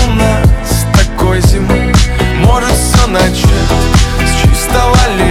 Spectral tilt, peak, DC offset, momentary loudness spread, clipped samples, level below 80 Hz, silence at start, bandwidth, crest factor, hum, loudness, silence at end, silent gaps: -5 dB/octave; 0 dBFS; under 0.1%; 2 LU; under 0.1%; -12 dBFS; 0 s; 16.5 kHz; 8 dB; none; -10 LUFS; 0 s; none